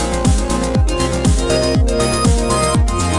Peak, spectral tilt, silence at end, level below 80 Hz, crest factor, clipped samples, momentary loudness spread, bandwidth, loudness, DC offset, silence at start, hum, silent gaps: -2 dBFS; -5 dB/octave; 0 s; -20 dBFS; 12 dB; under 0.1%; 2 LU; 12 kHz; -15 LUFS; under 0.1%; 0 s; none; none